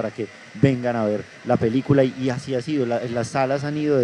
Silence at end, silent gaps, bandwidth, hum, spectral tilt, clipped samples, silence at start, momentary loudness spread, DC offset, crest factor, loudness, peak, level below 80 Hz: 0 s; none; 10.5 kHz; none; -7 dB/octave; under 0.1%; 0 s; 8 LU; under 0.1%; 20 dB; -22 LUFS; -2 dBFS; -56 dBFS